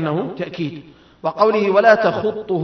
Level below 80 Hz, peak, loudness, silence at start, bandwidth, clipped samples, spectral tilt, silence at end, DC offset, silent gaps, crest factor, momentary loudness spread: -60 dBFS; 0 dBFS; -18 LUFS; 0 s; 6.4 kHz; under 0.1%; -7 dB/octave; 0 s; under 0.1%; none; 18 dB; 14 LU